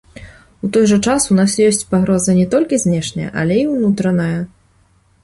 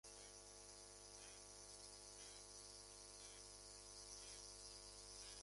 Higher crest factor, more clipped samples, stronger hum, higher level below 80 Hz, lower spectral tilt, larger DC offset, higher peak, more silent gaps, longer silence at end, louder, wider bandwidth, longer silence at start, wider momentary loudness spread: about the same, 14 dB vs 18 dB; neither; second, none vs 50 Hz at -70 dBFS; first, -44 dBFS vs -72 dBFS; first, -5.5 dB/octave vs -1 dB/octave; neither; first, -2 dBFS vs -42 dBFS; neither; first, 0.75 s vs 0 s; first, -15 LUFS vs -57 LUFS; about the same, 11.5 kHz vs 11.5 kHz; about the same, 0.15 s vs 0.05 s; first, 8 LU vs 3 LU